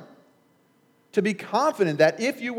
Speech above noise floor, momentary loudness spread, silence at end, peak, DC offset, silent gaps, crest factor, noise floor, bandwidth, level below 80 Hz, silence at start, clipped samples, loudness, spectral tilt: 40 dB; 6 LU; 0 s; -6 dBFS; under 0.1%; none; 20 dB; -63 dBFS; 16.5 kHz; -88 dBFS; 0 s; under 0.1%; -23 LUFS; -5.5 dB/octave